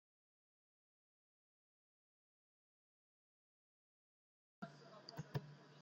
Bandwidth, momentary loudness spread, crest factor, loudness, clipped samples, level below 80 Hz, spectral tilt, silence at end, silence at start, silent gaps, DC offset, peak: 7.4 kHz; 9 LU; 28 dB; -54 LUFS; under 0.1%; -88 dBFS; -5.5 dB/octave; 0 s; 4.6 s; none; under 0.1%; -32 dBFS